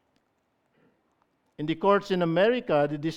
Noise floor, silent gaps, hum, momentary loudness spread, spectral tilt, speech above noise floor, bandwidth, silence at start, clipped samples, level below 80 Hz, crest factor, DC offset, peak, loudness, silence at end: -73 dBFS; none; none; 7 LU; -7 dB/octave; 49 dB; 8.6 kHz; 1.6 s; under 0.1%; -64 dBFS; 20 dB; under 0.1%; -8 dBFS; -25 LUFS; 0 s